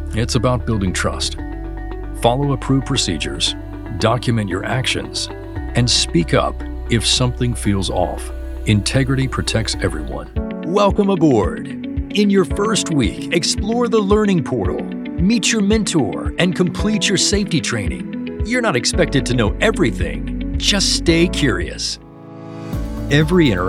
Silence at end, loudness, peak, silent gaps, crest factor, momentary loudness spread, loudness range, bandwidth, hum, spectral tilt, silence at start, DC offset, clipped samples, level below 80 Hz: 0 s; -18 LUFS; 0 dBFS; none; 18 dB; 11 LU; 2 LU; 14.5 kHz; none; -4.5 dB/octave; 0 s; under 0.1%; under 0.1%; -28 dBFS